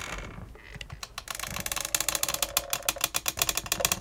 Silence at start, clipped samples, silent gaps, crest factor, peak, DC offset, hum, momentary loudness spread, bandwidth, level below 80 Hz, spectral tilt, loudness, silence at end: 0 s; under 0.1%; none; 26 dB; -6 dBFS; under 0.1%; none; 16 LU; 19 kHz; -48 dBFS; -0.5 dB/octave; -28 LUFS; 0 s